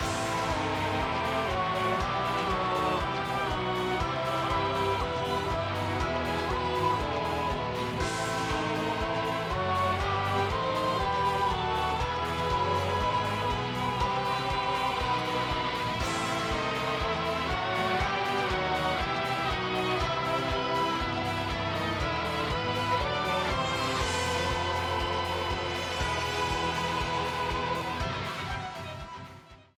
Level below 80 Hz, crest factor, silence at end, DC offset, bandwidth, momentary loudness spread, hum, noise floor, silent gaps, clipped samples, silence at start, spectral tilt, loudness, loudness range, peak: -44 dBFS; 14 dB; 0.2 s; under 0.1%; 19 kHz; 3 LU; none; -51 dBFS; none; under 0.1%; 0 s; -4.5 dB/octave; -29 LUFS; 1 LU; -16 dBFS